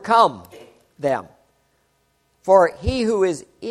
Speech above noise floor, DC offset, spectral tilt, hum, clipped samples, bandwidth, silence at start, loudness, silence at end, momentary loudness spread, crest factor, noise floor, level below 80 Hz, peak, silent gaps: 47 dB; under 0.1%; -5.5 dB/octave; none; under 0.1%; 13 kHz; 0.05 s; -19 LUFS; 0 s; 14 LU; 20 dB; -65 dBFS; -40 dBFS; 0 dBFS; none